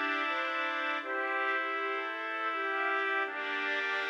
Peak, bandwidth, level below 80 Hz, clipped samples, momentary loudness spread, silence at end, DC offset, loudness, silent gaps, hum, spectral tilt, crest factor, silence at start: -18 dBFS; 13.5 kHz; under -90 dBFS; under 0.1%; 3 LU; 0 s; under 0.1%; -32 LUFS; none; none; -0.5 dB/octave; 16 dB; 0 s